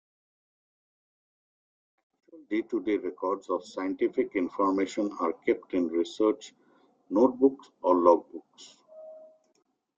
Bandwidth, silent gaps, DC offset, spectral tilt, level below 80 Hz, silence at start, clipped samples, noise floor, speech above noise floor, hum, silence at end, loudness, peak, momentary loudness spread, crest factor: 7.8 kHz; none; under 0.1%; -5.5 dB/octave; -72 dBFS; 2.35 s; under 0.1%; -64 dBFS; 37 dB; none; 0.7 s; -28 LUFS; -6 dBFS; 14 LU; 24 dB